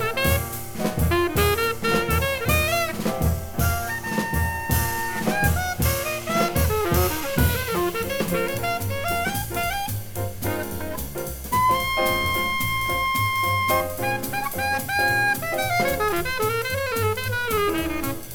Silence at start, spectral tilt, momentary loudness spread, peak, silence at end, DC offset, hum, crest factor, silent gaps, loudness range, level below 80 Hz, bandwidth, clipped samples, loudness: 0 s; -4.5 dB/octave; 7 LU; -6 dBFS; 0 s; under 0.1%; none; 18 dB; none; 3 LU; -34 dBFS; over 20 kHz; under 0.1%; -23 LUFS